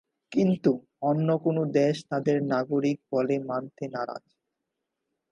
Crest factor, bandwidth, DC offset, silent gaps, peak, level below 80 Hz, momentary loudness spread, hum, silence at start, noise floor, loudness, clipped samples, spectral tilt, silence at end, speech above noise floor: 18 dB; 11 kHz; under 0.1%; none; -10 dBFS; -74 dBFS; 9 LU; none; 0.3 s; -83 dBFS; -27 LUFS; under 0.1%; -8 dB/octave; 1.15 s; 57 dB